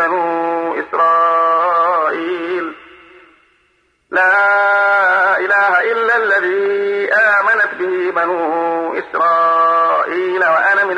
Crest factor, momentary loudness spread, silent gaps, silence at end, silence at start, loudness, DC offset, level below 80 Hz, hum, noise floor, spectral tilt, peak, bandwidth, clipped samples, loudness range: 12 dB; 8 LU; none; 0 s; 0 s; -14 LUFS; under 0.1%; -66 dBFS; none; -59 dBFS; -4.5 dB/octave; -4 dBFS; 10 kHz; under 0.1%; 4 LU